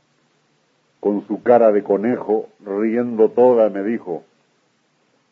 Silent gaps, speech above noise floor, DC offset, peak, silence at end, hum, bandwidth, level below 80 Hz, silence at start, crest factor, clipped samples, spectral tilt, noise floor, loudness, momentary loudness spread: none; 46 dB; under 0.1%; -2 dBFS; 1.1 s; none; 4.2 kHz; -72 dBFS; 1.05 s; 18 dB; under 0.1%; -9.5 dB/octave; -63 dBFS; -18 LUFS; 12 LU